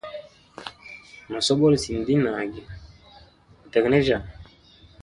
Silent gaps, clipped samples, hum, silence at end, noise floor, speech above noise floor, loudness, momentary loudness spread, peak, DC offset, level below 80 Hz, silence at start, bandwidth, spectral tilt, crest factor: none; under 0.1%; none; 0.6 s; -53 dBFS; 31 dB; -22 LUFS; 23 LU; -4 dBFS; under 0.1%; -48 dBFS; 0.05 s; 11.5 kHz; -5.5 dB/octave; 20 dB